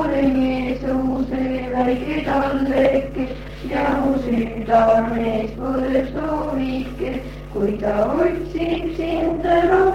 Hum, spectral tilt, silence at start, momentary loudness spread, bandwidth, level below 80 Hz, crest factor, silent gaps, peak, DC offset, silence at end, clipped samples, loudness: none; -7.5 dB/octave; 0 s; 9 LU; 10 kHz; -36 dBFS; 16 dB; none; -4 dBFS; under 0.1%; 0 s; under 0.1%; -20 LUFS